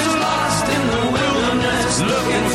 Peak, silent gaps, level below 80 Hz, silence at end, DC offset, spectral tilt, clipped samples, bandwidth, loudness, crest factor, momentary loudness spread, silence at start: -6 dBFS; none; -38 dBFS; 0 s; under 0.1%; -4 dB/octave; under 0.1%; 16 kHz; -17 LUFS; 12 dB; 1 LU; 0 s